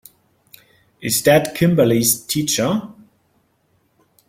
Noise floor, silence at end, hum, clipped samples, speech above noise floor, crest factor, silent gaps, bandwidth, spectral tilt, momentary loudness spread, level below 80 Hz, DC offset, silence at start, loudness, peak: -63 dBFS; 1.35 s; none; under 0.1%; 46 dB; 18 dB; none; 16.5 kHz; -4 dB/octave; 7 LU; -52 dBFS; under 0.1%; 1 s; -17 LUFS; -2 dBFS